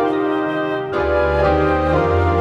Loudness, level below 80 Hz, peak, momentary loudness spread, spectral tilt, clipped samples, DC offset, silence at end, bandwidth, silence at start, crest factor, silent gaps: -17 LUFS; -30 dBFS; -4 dBFS; 5 LU; -8 dB/octave; under 0.1%; under 0.1%; 0 s; 7.8 kHz; 0 s; 12 dB; none